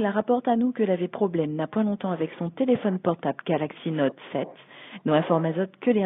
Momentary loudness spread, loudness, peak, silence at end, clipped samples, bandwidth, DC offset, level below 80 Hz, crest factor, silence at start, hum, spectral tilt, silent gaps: 9 LU; -26 LUFS; -6 dBFS; 0 s; under 0.1%; 4 kHz; under 0.1%; -72 dBFS; 18 dB; 0 s; none; -6.5 dB/octave; none